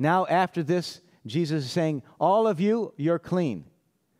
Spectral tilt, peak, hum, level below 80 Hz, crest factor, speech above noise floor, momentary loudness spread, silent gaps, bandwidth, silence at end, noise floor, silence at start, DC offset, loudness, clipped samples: -7 dB/octave; -10 dBFS; none; -70 dBFS; 16 dB; 43 dB; 9 LU; none; 14 kHz; 0.55 s; -68 dBFS; 0 s; under 0.1%; -26 LUFS; under 0.1%